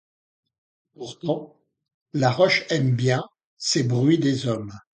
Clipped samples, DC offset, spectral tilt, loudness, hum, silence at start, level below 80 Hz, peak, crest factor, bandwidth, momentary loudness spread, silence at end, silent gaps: under 0.1%; under 0.1%; -5.5 dB/octave; -23 LUFS; none; 1 s; -62 dBFS; -6 dBFS; 18 dB; 9.4 kHz; 13 LU; 0.15 s; 1.94-2.06 s, 3.45-3.57 s